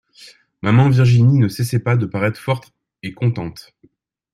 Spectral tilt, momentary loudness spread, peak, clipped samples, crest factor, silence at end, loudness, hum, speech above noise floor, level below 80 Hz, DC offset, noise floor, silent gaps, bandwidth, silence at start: -7.5 dB/octave; 15 LU; -2 dBFS; under 0.1%; 14 dB; 0.75 s; -17 LUFS; none; 30 dB; -50 dBFS; under 0.1%; -46 dBFS; none; 13 kHz; 0.65 s